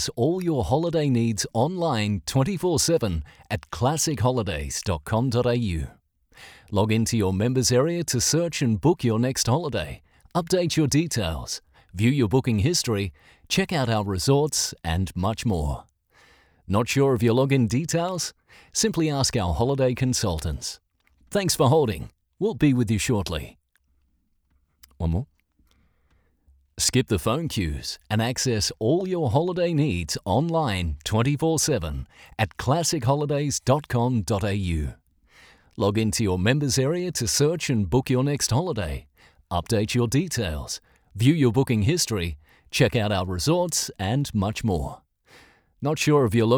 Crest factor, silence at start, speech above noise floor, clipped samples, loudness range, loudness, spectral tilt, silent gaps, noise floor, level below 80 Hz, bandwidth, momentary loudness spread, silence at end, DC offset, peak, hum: 18 dB; 0 s; 45 dB; under 0.1%; 3 LU; -24 LUFS; -5 dB/octave; none; -68 dBFS; -44 dBFS; over 20 kHz; 10 LU; 0 s; under 0.1%; -6 dBFS; none